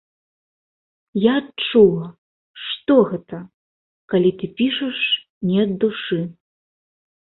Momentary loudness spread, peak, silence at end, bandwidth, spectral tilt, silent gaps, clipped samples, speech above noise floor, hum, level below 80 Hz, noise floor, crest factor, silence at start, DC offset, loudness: 15 LU; -2 dBFS; 0.95 s; 4.2 kHz; -11 dB/octave; 2.18-2.54 s, 3.54-4.08 s, 5.29-5.41 s; under 0.1%; over 72 dB; none; -60 dBFS; under -90 dBFS; 20 dB; 1.15 s; under 0.1%; -19 LUFS